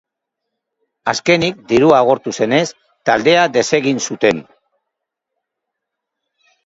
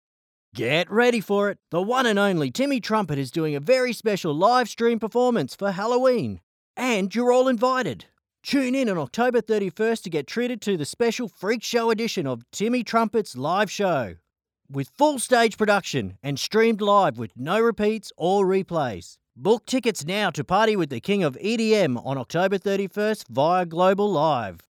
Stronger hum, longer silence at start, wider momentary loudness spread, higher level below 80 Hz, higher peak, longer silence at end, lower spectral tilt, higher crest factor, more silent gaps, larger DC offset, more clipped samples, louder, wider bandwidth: neither; first, 1.05 s vs 0.55 s; about the same, 10 LU vs 8 LU; first, -56 dBFS vs -64 dBFS; first, 0 dBFS vs -6 dBFS; first, 2.25 s vs 0.1 s; about the same, -4 dB/octave vs -5 dB/octave; about the same, 16 dB vs 18 dB; second, none vs 6.43-6.74 s; neither; neither; first, -15 LUFS vs -23 LUFS; second, 8 kHz vs 17 kHz